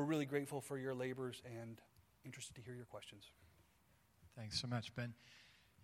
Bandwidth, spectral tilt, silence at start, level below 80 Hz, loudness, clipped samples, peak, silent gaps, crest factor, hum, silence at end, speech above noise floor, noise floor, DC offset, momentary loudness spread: 16.5 kHz; -5 dB/octave; 0 s; -76 dBFS; -46 LUFS; under 0.1%; -26 dBFS; none; 22 dB; none; 0 s; 28 dB; -74 dBFS; under 0.1%; 20 LU